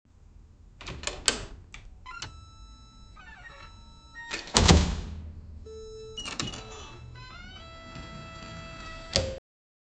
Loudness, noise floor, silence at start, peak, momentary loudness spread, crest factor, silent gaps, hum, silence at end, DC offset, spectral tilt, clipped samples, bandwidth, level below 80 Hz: -29 LUFS; -53 dBFS; 0.2 s; 0 dBFS; 24 LU; 32 dB; none; none; 0.6 s; under 0.1%; -3.5 dB/octave; under 0.1%; 9.4 kHz; -38 dBFS